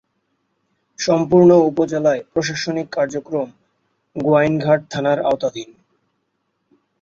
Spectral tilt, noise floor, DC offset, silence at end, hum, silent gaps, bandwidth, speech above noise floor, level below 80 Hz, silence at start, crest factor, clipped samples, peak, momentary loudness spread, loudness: -6 dB/octave; -71 dBFS; under 0.1%; 1.4 s; none; none; 7.6 kHz; 54 dB; -58 dBFS; 1 s; 16 dB; under 0.1%; -2 dBFS; 13 LU; -17 LUFS